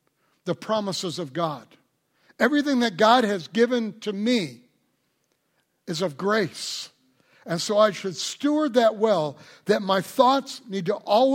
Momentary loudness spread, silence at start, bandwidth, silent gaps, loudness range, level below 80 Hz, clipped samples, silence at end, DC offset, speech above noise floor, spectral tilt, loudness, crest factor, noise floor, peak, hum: 12 LU; 0.45 s; 16.5 kHz; none; 6 LU; -72 dBFS; under 0.1%; 0 s; under 0.1%; 49 dB; -4.5 dB/octave; -24 LUFS; 22 dB; -72 dBFS; -4 dBFS; none